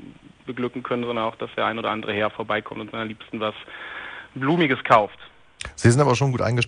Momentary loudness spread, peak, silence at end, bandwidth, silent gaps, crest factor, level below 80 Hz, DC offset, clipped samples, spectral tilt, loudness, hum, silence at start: 17 LU; -4 dBFS; 0 s; 10 kHz; none; 20 dB; -54 dBFS; under 0.1%; under 0.1%; -5.5 dB/octave; -23 LUFS; none; 0 s